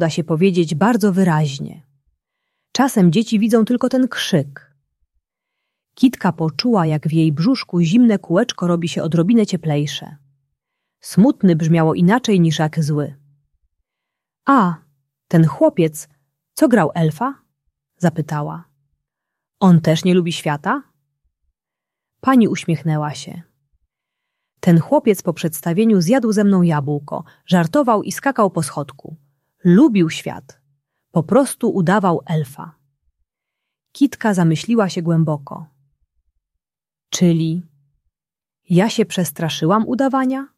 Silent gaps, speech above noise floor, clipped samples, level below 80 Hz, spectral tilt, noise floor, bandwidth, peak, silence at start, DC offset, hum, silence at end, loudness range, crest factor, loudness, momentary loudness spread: none; over 74 dB; under 0.1%; -60 dBFS; -6.5 dB/octave; under -90 dBFS; 14 kHz; -2 dBFS; 0 s; under 0.1%; none; 0.1 s; 4 LU; 16 dB; -17 LUFS; 11 LU